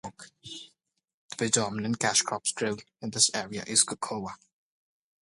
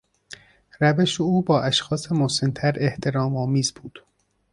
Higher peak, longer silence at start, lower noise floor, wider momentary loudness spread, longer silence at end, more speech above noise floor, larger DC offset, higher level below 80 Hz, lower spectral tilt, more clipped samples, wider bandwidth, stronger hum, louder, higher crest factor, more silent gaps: about the same, -6 dBFS vs -6 dBFS; second, 0.05 s vs 0.3 s; first, -72 dBFS vs -47 dBFS; second, 19 LU vs 23 LU; first, 0.9 s vs 0.55 s; first, 43 dB vs 25 dB; neither; second, -68 dBFS vs -56 dBFS; second, -2 dB/octave vs -5 dB/octave; neither; about the same, 11.5 kHz vs 11.5 kHz; neither; second, -27 LUFS vs -22 LUFS; first, 24 dB vs 18 dB; first, 1.14-1.29 s vs none